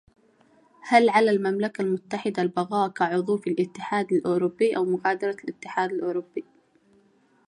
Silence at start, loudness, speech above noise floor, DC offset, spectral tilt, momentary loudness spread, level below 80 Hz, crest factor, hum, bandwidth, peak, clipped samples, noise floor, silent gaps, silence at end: 0.85 s; -25 LUFS; 38 dB; under 0.1%; -6 dB/octave; 11 LU; -74 dBFS; 20 dB; none; 11 kHz; -4 dBFS; under 0.1%; -62 dBFS; none; 1.05 s